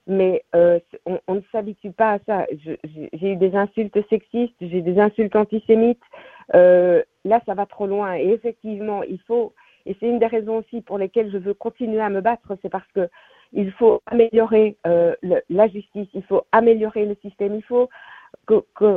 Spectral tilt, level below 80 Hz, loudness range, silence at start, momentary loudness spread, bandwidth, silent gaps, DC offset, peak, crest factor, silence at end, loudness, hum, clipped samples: -10 dB/octave; -60 dBFS; 6 LU; 0.05 s; 12 LU; 3.9 kHz; none; under 0.1%; -2 dBFS; 18 dB; 0 s; -20 LUFS; none; under 0.1%